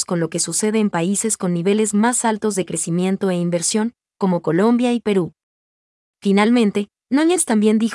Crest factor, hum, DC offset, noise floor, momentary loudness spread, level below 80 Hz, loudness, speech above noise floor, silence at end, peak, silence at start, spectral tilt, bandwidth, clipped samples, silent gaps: 14 dB; none; under 0.1%; under -90 dBFS; 6 LU; -66 dBFS; -18 LUFS; over 72 dB; 0 s; -4 dBFS; 0 s; -4.5 dB/octave; 12 kHz; under 0.1%; 5.43-6.14 s